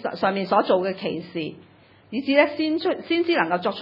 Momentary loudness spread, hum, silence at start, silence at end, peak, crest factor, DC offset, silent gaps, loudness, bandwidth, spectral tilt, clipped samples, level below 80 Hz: 12 LU; none; 0 s; 0 s; -4 dBFS; 18 dB; under 0.1%; none; -23 LUFS; 5.6 kHz; -8 dB/octave; under 0.1%; -72 dBFS